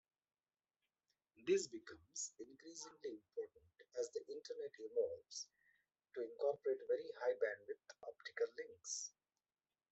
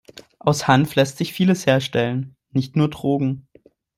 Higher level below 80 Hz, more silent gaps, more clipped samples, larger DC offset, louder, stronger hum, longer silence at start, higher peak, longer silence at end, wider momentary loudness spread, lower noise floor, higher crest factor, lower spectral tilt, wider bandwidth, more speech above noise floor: second, under -90 dBFS vs -56 dBFS; neither; neither; neither; second, -46 LUFS vs -20 LUFS; neither; first, 1.4 s vs 0.45 s; second, -26 dBFS vs -2 dBFS; first, 0.85 s vs 0.6 s; first, 13 LU vs 9 LU; first, under -90 dBFS vs -54 dBFS; about the same, 20 dB vs 18 dB; second, -2 dB/octave vs -6 dB/octave; second, 8.2 kHz vs 16 kHz; first, over 45 dB vs 35 dB